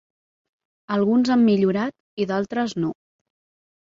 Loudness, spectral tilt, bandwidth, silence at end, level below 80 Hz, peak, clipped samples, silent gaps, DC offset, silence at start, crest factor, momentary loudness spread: -22 LUFS; -7 dB/octave; 7.6 kHz; 0.95 s; -66 dBFS; -8 dBFS; under 0.1%; 2.00-2.17 s; under 0.1%; 0.9 s; 14 dB; 11 LU